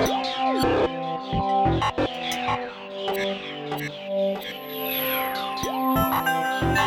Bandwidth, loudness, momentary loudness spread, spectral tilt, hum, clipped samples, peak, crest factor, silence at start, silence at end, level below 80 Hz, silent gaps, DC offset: over 20 kHz; -25 LUFS; 9 LU; -4.5 dB/octave; none; under 0.1%; -10 dBFS; 14 dB; 0 s; 0 s; -42 dBFS; none; under 0.1%